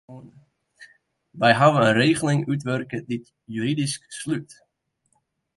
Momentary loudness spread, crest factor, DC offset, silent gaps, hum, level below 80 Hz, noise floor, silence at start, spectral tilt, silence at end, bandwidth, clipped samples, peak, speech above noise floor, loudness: 15 LU; 20 dB; under 0.1%; none; none; -62 dBFS; -72 dBFS; 0.1 s; -5.5 dB/octave; 1.15 s; 11.5 kHz; under 0.1%; -4 dBFS; 50 dB; -22 LUFS